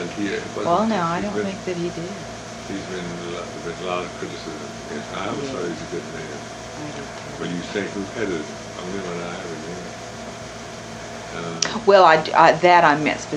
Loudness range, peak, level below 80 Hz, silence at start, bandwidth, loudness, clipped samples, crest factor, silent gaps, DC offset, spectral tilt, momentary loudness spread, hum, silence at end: 12 LU; 0 dBFS; -52 dBFS; 0 s; 12 kHz; -22 LUFS; under 0.1%; 22 dB; none; under 0.1%; -4 dB/octave; 20 LU; none; 0 s